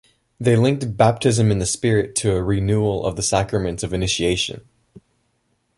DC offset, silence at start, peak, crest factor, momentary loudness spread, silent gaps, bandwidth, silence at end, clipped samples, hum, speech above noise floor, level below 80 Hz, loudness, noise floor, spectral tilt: under 0.1%; 0.4 s; -2 dBFS; 18 dB; 7 LU; none; 11.5 kHz; 0.8 s; under 0.1%; none; 49 dB; -40 dBFS; -20 LUFS; -68 dBFS; -5 dB/octave